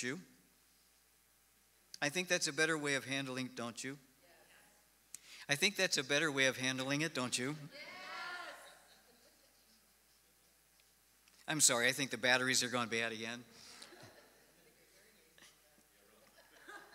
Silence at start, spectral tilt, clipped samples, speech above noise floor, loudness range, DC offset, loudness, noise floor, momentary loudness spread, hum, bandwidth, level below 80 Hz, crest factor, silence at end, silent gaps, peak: 0 s; -2 dB/octave; under 0.1%; 35 dB; 14 LU; under 0.1%; -35 LUFS; -71 dBFS; 24 LU; none; 16 kHz; -84 dBFS; 26 dB; 0.1 s; none; -14 dBFS